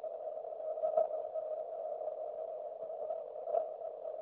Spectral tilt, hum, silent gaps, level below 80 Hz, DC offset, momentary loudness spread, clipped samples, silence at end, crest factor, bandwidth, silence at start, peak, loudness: -4.5 dB/octave; none; none; under -90 dBFS; under 0.1%; 9 LU; under 0.1%; 0 s; 20 dB; 3.5 kHz; 0 s; -18 dBFS; -40 LUFS